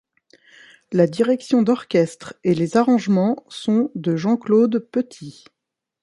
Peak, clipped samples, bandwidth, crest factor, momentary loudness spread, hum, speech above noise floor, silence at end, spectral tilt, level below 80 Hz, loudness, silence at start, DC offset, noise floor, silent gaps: -2 dBFS; under 0.1%; 11.5 kHz; 18 dB; 9 LU; none; 36 dB; 0.7 s; -7 dB/octave; -66 dBFS; -20 LUFS; 0.9 s; under 0.1%; -55 dBFS; none